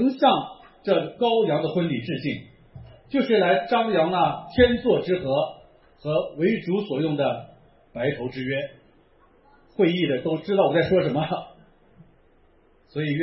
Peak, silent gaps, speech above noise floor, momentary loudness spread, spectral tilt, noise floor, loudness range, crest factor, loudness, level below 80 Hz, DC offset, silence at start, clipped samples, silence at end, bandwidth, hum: -4 dBFS; none; 36 dB; 12 LU; -10.5 dB/octave; -58 dBFS; 5 LU; 20 dB; -23 LUFS; -50 dBFS; under 0.1%; 0 s; under 0.1%; 0 s; 5.8 kHz; none